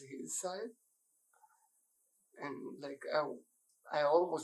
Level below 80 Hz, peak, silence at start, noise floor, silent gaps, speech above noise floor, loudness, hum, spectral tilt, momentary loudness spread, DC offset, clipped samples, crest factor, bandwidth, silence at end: under -90 dBFS; -16 dBFS; 0 s; -77 dBFS; none; 41 dB; -38 LUFS; none; -3.5 dB/octave; 16 LU; under 0.1%; under 0.1%; 22 dB; 14.5 kHz; 0 s